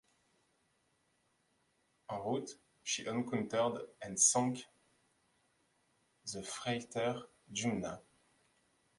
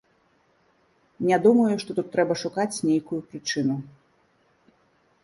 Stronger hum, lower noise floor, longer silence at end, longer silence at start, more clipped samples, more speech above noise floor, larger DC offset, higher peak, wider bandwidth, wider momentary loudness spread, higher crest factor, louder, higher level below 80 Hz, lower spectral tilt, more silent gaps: neither; first, -77 dBFS vs -65 dBFS; second, 1 s vs 1.4 s; first, 2.1 s vs 1.2 s; neither; about the same, 41 dB vs 41 dB; neither; second, -16 dBFS vs -6 dBFS; about the same, 11.5 kHz vs 11.5 kHz; first, 17 LU vs 11 LU; about the same, 24 dB vs 20 dB; second, -36 LUFS vs -24 LUFS; about the same, -74 dBFS vs -70 dBFS; second, -3 dB/octave vs -5.5 dB/octave; neither